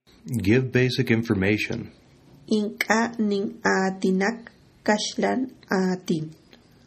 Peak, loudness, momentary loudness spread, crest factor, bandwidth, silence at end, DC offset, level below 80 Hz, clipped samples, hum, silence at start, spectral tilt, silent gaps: -4 dBFS; -24 LUFS; 8 LU; 20 dB; 14.5 kHz; 0.55 s; under 0.1%; -60 dBFS; under 0.1%; none; 0.25 s; -5.5 dB/octave; none